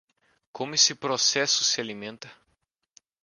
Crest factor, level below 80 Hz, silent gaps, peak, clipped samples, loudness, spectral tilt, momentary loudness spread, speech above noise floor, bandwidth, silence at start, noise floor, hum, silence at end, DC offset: 24 dB; -76 dBFS; none; -4 dBFS; under 0.1%; -22 LUFS; -0.5 dB/octave; 17 LU; 49 dB; 11 kHz; 0.55 s; -75 dBFS; none; 0.9 s; under 0.1%